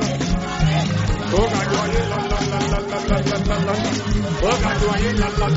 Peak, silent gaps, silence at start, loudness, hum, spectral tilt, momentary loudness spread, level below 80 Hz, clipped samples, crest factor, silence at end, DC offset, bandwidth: -4 dBFS; none; 0 s; -20 LUFS; none; -5 dB/octave; 3 LU; -26 dBFS; under 0.1%; 16 dB; 0 s; under 0.1%; 8 kHz